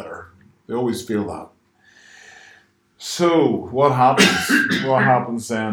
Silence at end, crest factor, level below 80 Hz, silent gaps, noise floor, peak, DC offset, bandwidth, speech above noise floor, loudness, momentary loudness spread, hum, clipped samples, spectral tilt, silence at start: 0 s; 20 dB; -58 dBFS; none; -54 dBFS; 0 dBFS; under 0.1%; 20 kHz; 36 dB; -18 LUFS; 17 LU; none; under 0.1%; -4.5 dB/octave; 0 s